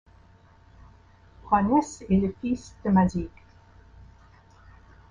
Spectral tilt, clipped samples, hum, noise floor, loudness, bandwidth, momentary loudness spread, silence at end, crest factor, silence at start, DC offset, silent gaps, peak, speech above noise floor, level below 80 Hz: -7.5 dB/octave; under 0.1%; none; -55 dBFS; -25 LUFS; 9.6 kHz; 9 LU; 1.05 s; 20 dB; 1.45 s; under 0.1%; none; -8 dBFS; 31 dB; -48 dBFS